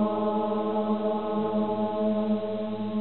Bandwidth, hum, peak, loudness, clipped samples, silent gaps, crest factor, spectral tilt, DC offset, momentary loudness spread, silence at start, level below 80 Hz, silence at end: 4.3 kHz; none; -14 dBFS; -28 LUFS; under 0.1%; none; 14 dB; -7 dB/octave; 0.5%; 3 LU; 0 s; -62 dBFS; 0 s